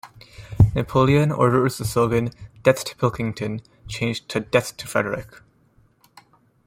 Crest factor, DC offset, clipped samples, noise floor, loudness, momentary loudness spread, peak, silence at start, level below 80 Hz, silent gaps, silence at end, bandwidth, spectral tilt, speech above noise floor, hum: 20 dB; under 0.1%; under 0.1%; -59 dBFS; -21 LUFS; 12 LU; -2 dBFS; 0.05 s; -42 dBFS; none; 1.45 s; 16.5 kHz; -6 dB/octave; 37 dB; none